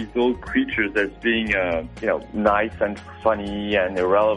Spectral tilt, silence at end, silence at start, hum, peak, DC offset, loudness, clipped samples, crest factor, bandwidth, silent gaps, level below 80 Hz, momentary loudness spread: -6.5 dB/octave; 0 s; 0 s; none; -4 dBFS; under 0.1%; -22 LUFS; under 0.1%; 16 dB; 10.5 kHz; none; -44 dBFS; 5 LU